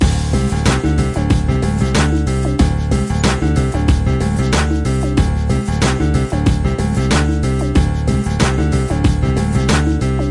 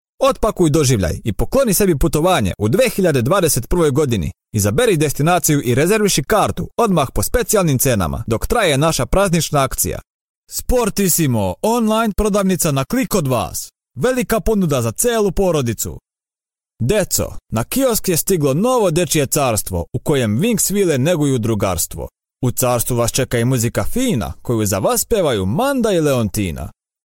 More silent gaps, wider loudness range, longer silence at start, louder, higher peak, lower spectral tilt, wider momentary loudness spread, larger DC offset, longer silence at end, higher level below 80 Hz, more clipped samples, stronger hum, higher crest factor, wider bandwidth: second, none vs 10.10-10.43 s; second, 0 LU vs 3 LU; second, 0 s vs 0.2 s; about the same, -16 LUFS vs -17 LUFS; about the same, 0 dBFS vs -2 dBFS; about the same, -6 dB/octave vs -5 dB/octave; second, 2 LU vs 7 LU; second, under 0.1% vs 0.2%; second, 0 s vs 0.35 s; first, -20 dBFS vs -32 dBFS; neither; neither; about the same, 14 dB vs 14 dB; second, 11.5 kHz vs 17 kHz